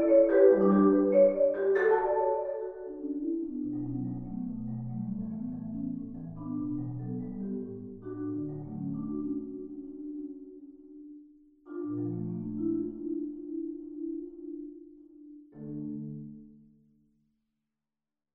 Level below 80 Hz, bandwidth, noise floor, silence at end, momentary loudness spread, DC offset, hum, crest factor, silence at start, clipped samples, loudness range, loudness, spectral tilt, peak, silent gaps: -58 dBFS; 3.9 kHz; under -90 dBFS; 1.85 s; 22 LU; under 0.1%; none; 20 dB; 0 s; under 0.1%; 15 LU; -31 LUFS; -9.5 dB/octave; -10 dBFS; none